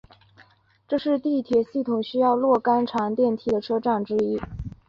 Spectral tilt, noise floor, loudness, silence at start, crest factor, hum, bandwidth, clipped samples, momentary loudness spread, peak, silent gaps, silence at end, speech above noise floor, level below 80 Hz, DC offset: -7.5 dB/octave; -57 dBFS; -23 LUFS; 0.9 s; 16 dB; none; 7.4 kHz; under 0.1%; 6 LU; -8 dBFS; none; 0.2 s; 34 dB; -50 dBFS; under 0.1%